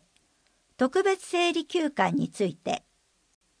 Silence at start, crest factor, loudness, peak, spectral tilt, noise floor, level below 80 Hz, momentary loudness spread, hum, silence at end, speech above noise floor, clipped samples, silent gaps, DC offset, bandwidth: 0.8 s; 20 dB; -27 LUFS; -10 dBFS; -4.5 dB/octave; -68 dBFS; -70 dBFS; 8 LU; none; 0.85 s; 42 dB; under 0.1%; none; under 0.1%; 10.5 kHz